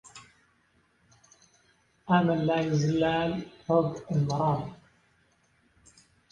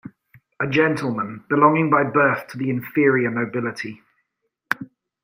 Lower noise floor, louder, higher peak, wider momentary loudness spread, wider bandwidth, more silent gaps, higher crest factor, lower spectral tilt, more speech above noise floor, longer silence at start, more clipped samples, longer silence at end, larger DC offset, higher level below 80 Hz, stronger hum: second, -68 dBFS vs -75 dBFS; second, -27 LUFS vs -20 LUFS; second, -8 dBFS vs 0 dBFS; about the same, 12 LU vs 11 LU; second, 9.2 kHz vs 16 kHz; neither; about the same, 22 dB vs 20 dB; about the same, -7 dB/octave vs -7.5 dB/octave; second, 41 dB vs 55 dB; about the same, 0.15 s vs 0.05 s; neither; first, 1.55 s vs 0.4 s; neither; about the same, -60 dBFS vs -64 dBFS; neither